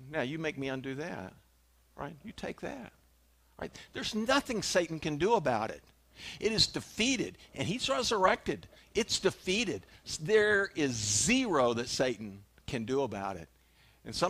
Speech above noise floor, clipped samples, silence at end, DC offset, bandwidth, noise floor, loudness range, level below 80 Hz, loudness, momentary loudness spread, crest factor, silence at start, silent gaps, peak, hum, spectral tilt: 34 dB; under 0.1%; 0 s; under 0.1%; 15.5 kHz; -66 dBFS; 11 LU; -58 dBFS; -31 LUFS; 17 LU; 22 dB; 0 s; none; -12 dBFS; none; -3 dB/octave